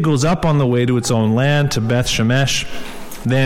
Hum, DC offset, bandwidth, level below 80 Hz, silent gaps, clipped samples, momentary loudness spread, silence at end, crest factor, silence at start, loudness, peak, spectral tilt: none; under 0.1%; 16 kHz; -34 dBFS; none; under 0.1%; 10 LU; 0 s; 12 dB; 0 s; -16 LUFS; -4 dBFS; -5.5 dB/octave